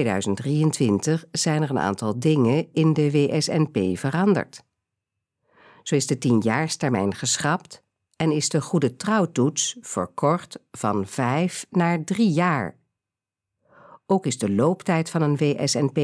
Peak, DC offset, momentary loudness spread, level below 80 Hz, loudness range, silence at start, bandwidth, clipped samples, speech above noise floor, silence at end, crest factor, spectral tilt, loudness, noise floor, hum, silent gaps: -6 dBFS; under 0.1%; 5 LU; -66 dBFS; 3 LU; 0 s; 11 kHz; under 0.1%; 66 dB; 0 s; 16 dB; -5.5 dB/octave; -23 LUFS; -88 dBFS; none; none